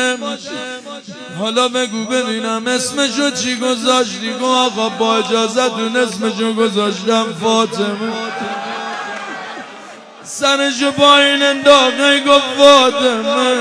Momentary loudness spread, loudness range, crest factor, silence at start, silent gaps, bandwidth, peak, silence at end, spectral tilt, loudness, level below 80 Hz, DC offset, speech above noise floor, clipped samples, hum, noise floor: 16 LU; 9 LU; 14 dB; 0 s; none; 11 kHz; 0 dBFS; 0 s; -2.5 dB/octave; -14 LUFS; -58 dBFS; under 0.1%; 21 dB; 0.1%; none; -35 dBFS